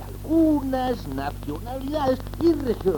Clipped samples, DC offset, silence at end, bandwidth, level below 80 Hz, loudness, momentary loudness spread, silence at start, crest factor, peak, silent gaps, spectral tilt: under 0.1%; under 0.1%; 0 s; 19 kHz; -38 dBFS; -24 LUFS; 11 LU; 0 s; 14 dB; -8 dBFS; none; -7.5 dB/octave